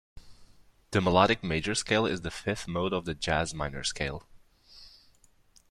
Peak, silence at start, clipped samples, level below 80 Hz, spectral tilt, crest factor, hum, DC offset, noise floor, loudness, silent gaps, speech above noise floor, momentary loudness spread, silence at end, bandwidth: -8 dBFS; 0.15 s; under 0.1%; -50 dBFS; -4.5 dB/octave; 24 dB; none; under 0.1%; -62 dBFS; -29 LUFS; none; 33 dB; 10 LU; 0.8 s; 13 kHz